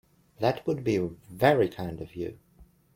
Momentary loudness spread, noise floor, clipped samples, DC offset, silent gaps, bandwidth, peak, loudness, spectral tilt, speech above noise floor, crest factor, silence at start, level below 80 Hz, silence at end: 14 LU; -58 dBFS; under 0.1%; under 0.1%; none; 16.5 kHz; -8 dBFS; -28 LUFS; -7 dB/octave; 30 dB; 22 dB; 0.4 s; -58 dBFS; 0.35 s